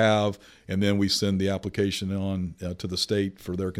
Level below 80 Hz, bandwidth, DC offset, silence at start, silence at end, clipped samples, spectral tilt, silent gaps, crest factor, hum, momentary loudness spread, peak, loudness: -54 dBFS; 15.5 kHz; under 0.1%; 0 s; 0 s; under 0.1%; -5 dB/octave; none; 18 dB; none; 9 LU; -10 dBFS; -27 LUFS